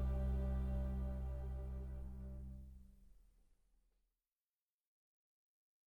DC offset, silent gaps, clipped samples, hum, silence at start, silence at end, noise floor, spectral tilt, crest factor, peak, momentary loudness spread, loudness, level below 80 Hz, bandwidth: under 0.1%; none; under 0.1%; none; 0 s; 2.7 s; under -90 dBFS; -9.5 dB/octave; 14 dB; -32 dBFS; 15 LU; -45 LUFS; -46 dBFS; 3.7 kHz